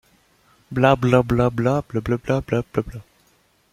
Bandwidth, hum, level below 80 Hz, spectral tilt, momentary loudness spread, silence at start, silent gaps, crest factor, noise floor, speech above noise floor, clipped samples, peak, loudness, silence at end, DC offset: 14 kHz; none; -44 dBFS; -7.5 dB/octave; 11 LU; 0.7 s; none; 20 dB; -61 dBFS; 41 dB; under 0.1%; -2 dBFS; -20 LUFS; 0.7 s; under 0.1%